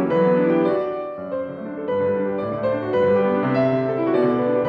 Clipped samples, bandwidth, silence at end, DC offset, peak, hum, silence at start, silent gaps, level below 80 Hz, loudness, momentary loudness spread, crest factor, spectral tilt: under 0.1%; 5 kHz; 0 s; under 0.1%; -6 dBFS; none; 0 s; none; -60 dBFS; -21 LUFS; 10 LU; 14 dB; -9.5 dB/octave